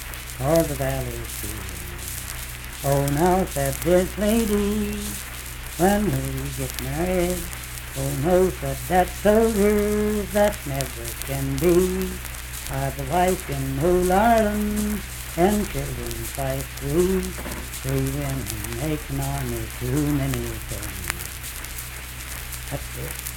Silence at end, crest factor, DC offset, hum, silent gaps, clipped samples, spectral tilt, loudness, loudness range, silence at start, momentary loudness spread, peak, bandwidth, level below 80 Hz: 0 s; 22 dB; under 0.1%; none; none; under 0.1%; -5 dB/octave; -24 LUFS; 5 LU; 0 s; 12 LU; -2 dBFS; 19 kHz; -34 dBFS